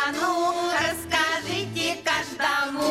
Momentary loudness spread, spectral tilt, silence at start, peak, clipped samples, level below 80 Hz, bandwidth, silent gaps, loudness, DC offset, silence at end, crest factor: 3 LU; -2.5 dB/octave; 0 s; -10 dBFS; under 0.1%; -56 dBFS; 16 kHz; none; -24 LUFS; under 0.1%; 0 s; 14 dB